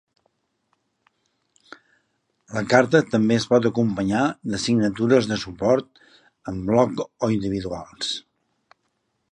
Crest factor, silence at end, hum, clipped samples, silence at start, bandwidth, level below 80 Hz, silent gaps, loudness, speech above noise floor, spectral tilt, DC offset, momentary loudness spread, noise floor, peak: 22 dB; 1.1 s; none; under 0.1%; 2.5 s; 10.5 kHz; -54 dBFS; none; -22 LUFS; 52 dB; -5.5 dB/octave; under 0.1%; 11 LU; -73 dBFS; -2 dBFS